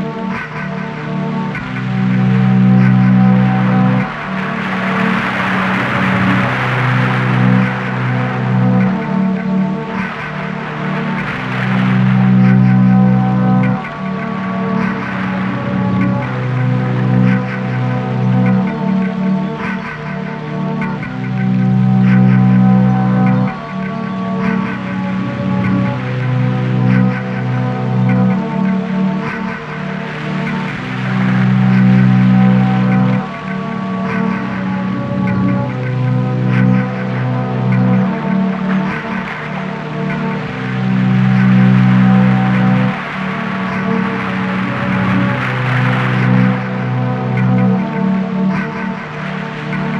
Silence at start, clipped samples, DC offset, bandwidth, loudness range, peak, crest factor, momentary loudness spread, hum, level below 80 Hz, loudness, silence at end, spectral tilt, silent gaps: 0 s; under 0.1%; under 0.1%; 6.4 kHz; 4 LU; 0 dBFS; 14 dB; 11 LU; none; -46 dBFS; -15 LUFS; 0 s; -8.5 dB/octave; none